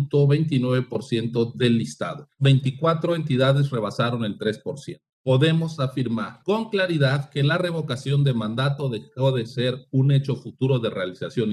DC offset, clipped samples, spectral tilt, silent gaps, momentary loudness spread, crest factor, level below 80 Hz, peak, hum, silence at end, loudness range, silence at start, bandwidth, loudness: under 0.1%; under 0.1%; -7 dB/octave; 5.13-5.24 s; 9 LU; 14 dB; -64 dBFS; -8 dBFS; none; 0 s; 2 LU; 0 s; 11 kHz; -23 LUFS